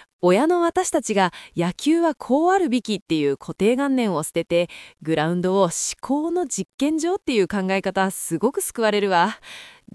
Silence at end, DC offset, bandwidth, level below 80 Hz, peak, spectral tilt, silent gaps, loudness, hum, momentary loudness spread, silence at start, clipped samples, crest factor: 0.25 s; under 0.1%; 12 kHz; -58 dBFS; -6 dBFS; -4.5 dB/octave; 3.02-3.06 s, 6.74-6.78 s; -21 LUFS; none; 6 LU; 0.25 s; under 0.1%; 16 dB